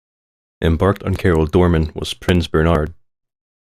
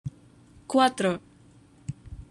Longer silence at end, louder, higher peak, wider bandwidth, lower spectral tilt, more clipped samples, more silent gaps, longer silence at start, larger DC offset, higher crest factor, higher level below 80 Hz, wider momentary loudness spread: first, 0.75 s vs 0.05 s; first, -17 LUFS vs -25 LUFS; first, -2 dBFS vs -6 dBFS; first, 14.5 kHz vs 12.5 kHz; first, -7 dB/octave vs -5 dB/octave; neither; neither; first, 0.6 s vs 0.05 s; neither; second, 16 dB vs 24 dB; first, -32 dBFS vs -52 dBFS; second, 8 LU vs 19 LU